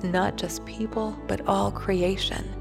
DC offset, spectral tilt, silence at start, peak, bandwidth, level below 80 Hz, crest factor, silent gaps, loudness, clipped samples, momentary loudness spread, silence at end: under 0.1%; -5 dB/octave; 0 s; -10 dBFS; 15.5 kHz; -40 dBFS; 18 dB; none; -27 LUFS; under 0.1%; 7 LU; 0 s